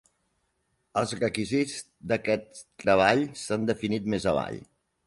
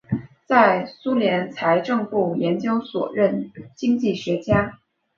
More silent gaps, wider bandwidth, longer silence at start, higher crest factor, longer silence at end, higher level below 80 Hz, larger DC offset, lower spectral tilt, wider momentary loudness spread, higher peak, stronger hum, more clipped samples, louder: neither; first, 11.5 kHz vs 7.2 kHz; first, 0.95 s vs 0.1 s; about the same, 22 dB vs 20 dB; about the same, 0.45 s vs 0.4 s; second, -56 dBFS vs -50 dBFS; neither; second, -5 dB/octave vs -7 dB/octave; about the same, 11 LU vs 10 LU; second, -6 dBFS vs -2 dBFS; neither; neither; second, -27 LUFS vs -21 LUFS